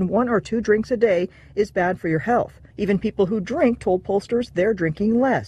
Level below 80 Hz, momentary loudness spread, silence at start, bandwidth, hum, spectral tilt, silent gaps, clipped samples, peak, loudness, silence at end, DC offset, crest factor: -48 dBFS; 4 LU; 0 s; 11 kHz; none; -7.5 dB/octave; none; under 0.1%; -6 dBFS; -22 LUFS; 0 s; under 0.1%; 14 dB